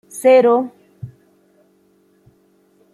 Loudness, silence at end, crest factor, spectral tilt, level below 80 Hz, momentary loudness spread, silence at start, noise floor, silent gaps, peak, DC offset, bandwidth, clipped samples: -13 LUFS; 1.85 s; 16 dB; -5.5 dB/octave; -64 dBFS; 26 LU; 0.15 s; -57 dBFS; none; -2 dBFS; under 0.1%; 15 kHz; under 0.1%